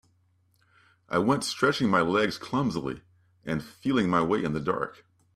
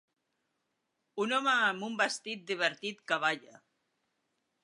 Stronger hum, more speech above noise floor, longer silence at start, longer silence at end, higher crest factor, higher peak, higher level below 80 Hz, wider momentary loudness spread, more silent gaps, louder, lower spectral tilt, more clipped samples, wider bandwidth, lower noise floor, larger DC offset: neither; second, 40 dB vs 50 dB; about the same, 1.1 s vs 1.15 s; second, 0.45 s vs 1.25 s; about the same, 18 dB vs 22 dB; about the same, -10 dBFS vs -12 dBFS; first, -60 dBFS vs -90 dBFS; about the same, 11 LU vs 11 LU; neither; first, -27 LUFS vs -31 LUFS; first, -5.5 dB/octave vs -2.5 dB/octave; neither; first, 14.5 kHz vs 11.5 kHz; second, -67 dBFS vs -82 dBFS; neither